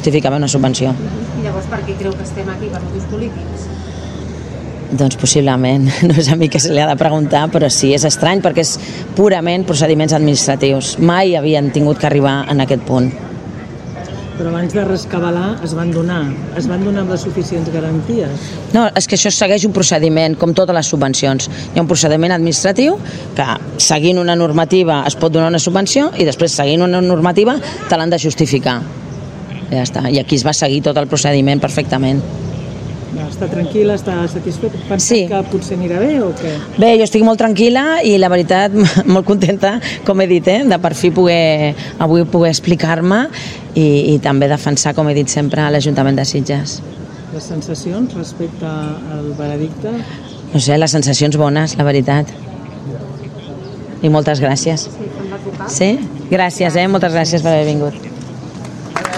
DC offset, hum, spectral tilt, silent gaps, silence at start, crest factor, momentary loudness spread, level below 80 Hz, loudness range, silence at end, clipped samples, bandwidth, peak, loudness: under 0.1%; none; -5 dB/octave; none; 0 s; 14 dB; 14 LU; -42 dBFS; 6 LU; 0 s; under 0.1%; 12 kHz; 0 dBFS; -14 LUFS